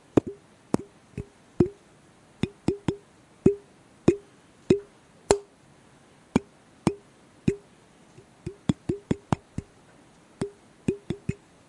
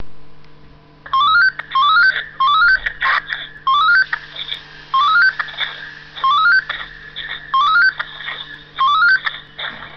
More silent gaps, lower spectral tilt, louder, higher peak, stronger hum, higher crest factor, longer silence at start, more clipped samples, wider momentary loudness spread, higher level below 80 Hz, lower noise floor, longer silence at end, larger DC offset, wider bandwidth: neither; first, -6.5 dB/octave vs -1.5 dB/octave; second, -29 LUFS vs -14 LUFS; first, 0 dBFS vs -4 dBFS; neither; first, 30 dB vs 14 dB; first, 0.15 s vs 0 s; neither; about the same, 16 LU vs 15 LU; about the same, -52 dBFS vs -50 dBFS; first, -56 dBFS vs -43 dBFS; first, 0.35 s vs 0 s; neither; first, 11.5 kHz vs 6.6 kHz